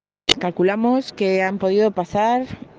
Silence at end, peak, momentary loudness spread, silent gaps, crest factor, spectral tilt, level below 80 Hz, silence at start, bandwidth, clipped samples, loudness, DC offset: 0.15 s; 0 dBFS; 3 LU; none; 20 dB; -4.5 dB/octave; -52 dBFS; 0.3 s; 9.8 kHz; under 0.1%; -19 LUFS; under 0.1%